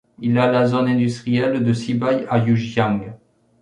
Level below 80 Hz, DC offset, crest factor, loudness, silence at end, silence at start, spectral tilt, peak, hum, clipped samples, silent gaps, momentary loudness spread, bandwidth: -56 dBFS; under 0.1%; 16 dB; -19 LUFS; 0.45 s; 0.2 s; -7.5 dB/octave; -2 dBFS; none; under 0.1%; none; 4 LU; 10 kHz